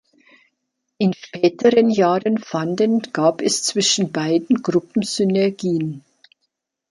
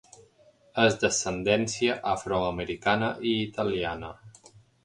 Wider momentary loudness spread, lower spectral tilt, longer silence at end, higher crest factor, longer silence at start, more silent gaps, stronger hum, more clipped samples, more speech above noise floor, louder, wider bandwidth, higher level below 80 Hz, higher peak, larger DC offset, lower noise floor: about the same, 7 LU vs 8 LU; about the same, -4.5 dB/octave vs -4 dB/octave; first, 0.9 s vs 0.55 s; second, 16 dB vs 22 dB; first, 1 s vs 0.75 s; neither; neither; neither; first, 57 dB vs 33 dB; first, -19 LUFS vs -27 LUFS; about the same, 11.5 kHz vs 11.5 kHz; second, -66 dBFS vs -54 dBFS; first, -2 dBFS vs -8 dBFS; neither; first, -76 dBFS vs -60 dBFS